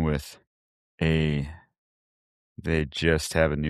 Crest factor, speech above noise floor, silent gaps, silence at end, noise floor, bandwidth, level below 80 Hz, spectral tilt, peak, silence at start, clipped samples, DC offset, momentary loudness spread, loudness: 22 dB; over 65 dB; 0.47-0.98 s, 1.78-2.56 s; 0 s; under -90 dBFS; 14 kHz; -40 dBFS; -5.5 dB/octave; -6 dBFS; 0 s; under 0.1%; under 0.1%; 13 LU; -26 LUFS